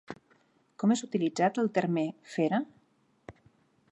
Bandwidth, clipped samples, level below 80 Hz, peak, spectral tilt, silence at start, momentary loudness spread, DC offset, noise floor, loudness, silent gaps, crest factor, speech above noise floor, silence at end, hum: 8.6 kHz; under 0.1%; -74 dBFS; -14 dBFS; -6 dB/octave; 0.1 s; 14 LU; under 0.1%; -69 dBFS; -30 LUFS; none; 18 dB; 40 dB; 0.6 s; none